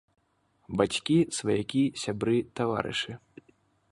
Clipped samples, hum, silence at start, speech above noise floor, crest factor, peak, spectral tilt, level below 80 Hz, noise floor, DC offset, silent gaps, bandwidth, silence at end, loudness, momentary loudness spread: under 0.1%; none; 0.7 s; 42 dB; 22 dB; -8 dBFS; -5 dB/octave; -60 dBFS; -70 dBFS; under 0.1%; none; 11.5 kHz; 0.75 s; -28 LUFS; 8 LU